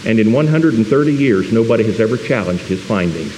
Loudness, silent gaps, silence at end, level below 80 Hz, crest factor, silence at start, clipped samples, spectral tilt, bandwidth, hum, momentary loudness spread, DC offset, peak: -15 LUFS; none; 0 s; -48 dBFS; 14 dB; 0 s; under 0.1%; -7.5 dB/octave; 11.5 kHz; none; 5 LU; under 0.1%; 0 dBFS